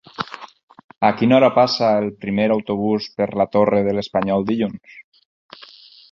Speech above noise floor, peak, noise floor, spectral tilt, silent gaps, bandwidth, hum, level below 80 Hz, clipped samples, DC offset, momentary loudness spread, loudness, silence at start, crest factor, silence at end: 27 dB; -2 dBFS; -45 dBFS; -7 dB/octave; 0.63-0.68 s, 0.84-0.89 s; 7.2 kHz; none; -56 dBFS; under 0.1%; under 0.1%; 14 LU; -18 LUFS; 0.2 s; 18 dB; 1.1 s